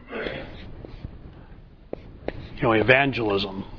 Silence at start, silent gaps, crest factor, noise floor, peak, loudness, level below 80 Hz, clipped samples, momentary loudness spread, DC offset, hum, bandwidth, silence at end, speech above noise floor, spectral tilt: 0 s; none; 26 dB; -46 dBFS; 0 dBFS; -22 LUFS; -44 dBFS; under 0.1%; 24 LU; under 0.1%; none; 5.4 kHz; 0 s; 25 dB; -7.5 dB/octave